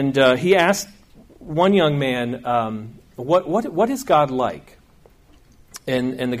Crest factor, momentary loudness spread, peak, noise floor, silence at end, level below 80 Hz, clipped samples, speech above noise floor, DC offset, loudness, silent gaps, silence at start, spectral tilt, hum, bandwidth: 16 dB; 17 LU; -4 dBFS; -52 dBFS; 0 s; -54 dBFS; under 0.1%; 33 dB; under 0.1%; -19 LUFS; none; 0 s; -5.5 dB/octave; none; 15.5 kHz